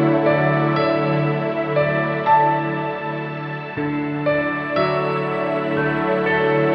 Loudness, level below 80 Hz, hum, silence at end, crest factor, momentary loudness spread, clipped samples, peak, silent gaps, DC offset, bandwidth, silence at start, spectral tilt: -20 LUFS; -54 dBFS; none; 0 s; 14 dB; 8 LU; under 0.1%; -6 dBFS; none; under 0.1%; 5.8 kHz; 0 s; -9 dB/octave